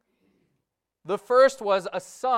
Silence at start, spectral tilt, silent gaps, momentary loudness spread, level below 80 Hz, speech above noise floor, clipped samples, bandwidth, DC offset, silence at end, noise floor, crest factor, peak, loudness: 1.05 s; -3.5 dB/octave; none; 13 LU; -74 dBFS; 57 dB; under 0.1%; 13 kHz; under 0.1%; 0 s; -80 dBFS; 18 dB; -8 dBFS; -23 LUFS